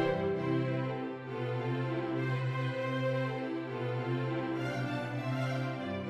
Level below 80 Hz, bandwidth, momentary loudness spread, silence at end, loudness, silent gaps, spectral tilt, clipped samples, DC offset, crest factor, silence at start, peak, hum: -68 dBFS; 8.2 kHz; 4 LU; 0 s; -34 LUFS; none; -8 dB/octave; under 0.1%; under 0.1%; 14 dB; 0 s; -20 dBFS; none